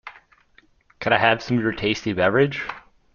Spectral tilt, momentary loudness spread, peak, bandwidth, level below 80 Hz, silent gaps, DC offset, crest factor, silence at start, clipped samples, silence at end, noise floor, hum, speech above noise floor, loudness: -6 dB/octave; 15 LU; -2 dBFS; 7.2 kHz; -52 dBFS; none; under 0.1%; 22 dB; 0.05 s; under 0.1%; 0.35 s; -58 dBFS; none; 37 dB; -21 LUFS